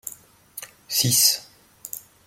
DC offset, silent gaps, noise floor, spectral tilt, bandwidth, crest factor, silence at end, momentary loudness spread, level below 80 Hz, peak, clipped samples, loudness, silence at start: under 0.1%; none; -47 dBFS; -1.5 dB/octave; 16.5 kHz; 22 dB; 0.3 s; 23 LU; -66 dBFS; -4 dBFS; under 0.1%; -19 LUFS; 0.05 s